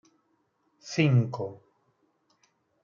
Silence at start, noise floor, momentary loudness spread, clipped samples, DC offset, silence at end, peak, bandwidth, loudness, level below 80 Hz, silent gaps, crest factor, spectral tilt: 0.85 s; -73 dBFS; 16 LU; under 0.1%; under 0.1%; 1.25 s; -10 dBFS; 7.2 kHz; -27 LUFS; -72 dBFS; none; 22 dB; -7 dB/octave